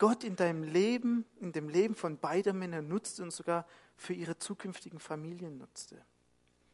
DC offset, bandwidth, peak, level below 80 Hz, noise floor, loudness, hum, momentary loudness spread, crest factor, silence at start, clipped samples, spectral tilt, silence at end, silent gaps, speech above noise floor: under 0.1%; 11.5 kHz; -14 dBFS; -80 dBFS; -71 dBFS; -35 LUFS; none; 17 LU; 22 dB; 0 s; under 0.1%; -5.5 dB/octave; 0.75 s; none; 37 dB